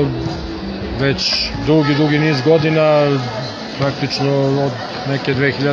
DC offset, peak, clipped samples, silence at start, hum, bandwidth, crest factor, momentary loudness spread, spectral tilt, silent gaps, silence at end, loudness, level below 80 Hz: under 0.1%; 0 dBFS; under 0.1%; 0 s; none; 7.2 kHz; 16 dB; 11 LU; -6 dB/octave; none; 0 s; -16 LUFS; -38 dBFS